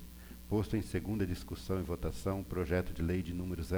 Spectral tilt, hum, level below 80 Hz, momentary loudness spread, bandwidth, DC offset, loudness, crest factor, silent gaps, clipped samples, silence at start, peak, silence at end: -7 dB/octave; none; -46 dBFS; 5 LU; over 20 kHz; under 0.1%; -37 LUFS; 14 dB; none; under 0.1%; 0 s; -22 dBFS; 0 s